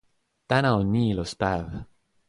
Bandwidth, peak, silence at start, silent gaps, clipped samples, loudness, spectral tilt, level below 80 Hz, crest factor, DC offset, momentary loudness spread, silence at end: 11.5 kHz; -8 dBFS; 0.5 s; none; under 0.1%; -25 LUFS; -6.5 dB/octave; -46 dBFS; 18 dB; under 0.1%; 12 LU; 0.45 s